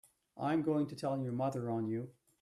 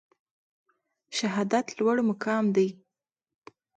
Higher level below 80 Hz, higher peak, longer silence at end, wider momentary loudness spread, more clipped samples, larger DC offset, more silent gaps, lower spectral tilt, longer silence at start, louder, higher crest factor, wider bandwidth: about the same, -76 dBFS vs -76 dBFS; second, -22 dBFS vs -12 dBFS; second, 0.3 s vs 1.05 s; about the same, 8 LU vs 6 LU; neither; neither; neither; first, -8 dB/octave vs -5 dB/octave; second, 0.35 s vs 1.1 s; second, -37 LUFS vs -27 LUFS; about the same, 14 dB vs 18 dB; first, 12.5 kHz vs 9.2 kHz